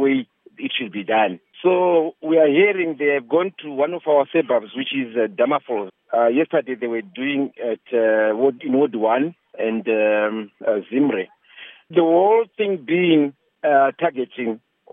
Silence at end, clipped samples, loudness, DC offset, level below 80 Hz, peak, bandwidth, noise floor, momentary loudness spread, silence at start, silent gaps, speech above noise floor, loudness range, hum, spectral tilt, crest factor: 0.35 s; under 0.1%; -20 LUFS; under 0.1%; -84 dBFS; -4 dBFS; 3.8 kHz; -44 dBFS; 10 LU; 0 s; none; 25 dB; 3 LU; none; -10 dB/octave; 16 dB